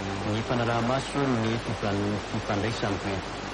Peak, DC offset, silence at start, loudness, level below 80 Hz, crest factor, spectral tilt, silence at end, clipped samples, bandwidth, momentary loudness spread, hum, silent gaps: -14 dBFS; under 0.1%; 0 s; -28 LUFS; -46 dBFS; 14 dB; -5.5 dB/octave; 0 s; under 0.1%; 11 kHz; 4 LU; none; none